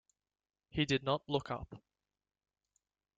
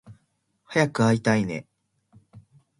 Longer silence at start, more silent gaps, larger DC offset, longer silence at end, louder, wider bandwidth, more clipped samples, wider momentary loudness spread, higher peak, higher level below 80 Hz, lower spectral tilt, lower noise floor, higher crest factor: first, 0.75 s vs 0.1 s; neither; neither; first, 1.4 s vs 0.4 s; second, -36 LUFS vs -23 LUFS; second, 8.8 kHz vs 11.5 kHz; neither; about the same, 11 LU vs 10 LU; second, -18 dBFS vs -6 dBFS; about the same, -64 dBFS vs -60 dBFS; about the same, -5.5 dB/octave vs -6 dB/octave; first, under -90 dBFS vs -71 dBFS; about the same, 22 dB vs 20 dB